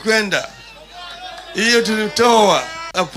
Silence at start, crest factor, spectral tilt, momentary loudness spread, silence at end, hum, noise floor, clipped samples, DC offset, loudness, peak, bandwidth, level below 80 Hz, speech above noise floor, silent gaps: 0 s; 14 dB; -2.5 dB/octave; 20 LU; 0 s; none; -37 dBFS; under 0.1%; under 0.1%; -15 LUFS; -2 dBFS; 16 kHz; -52 dBFS; 22 dB; none